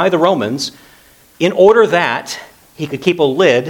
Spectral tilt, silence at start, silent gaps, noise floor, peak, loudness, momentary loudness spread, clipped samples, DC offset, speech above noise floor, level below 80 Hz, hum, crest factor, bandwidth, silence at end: -5 dB/octave; 0 s; none; -46 dBFS; 0 dBFS; -13 LUFS; 16 LU; under 0.1%; under 0.1%; 33 dB; -58 dBFS; none; 14 dB; 18.5 kHz; 0 s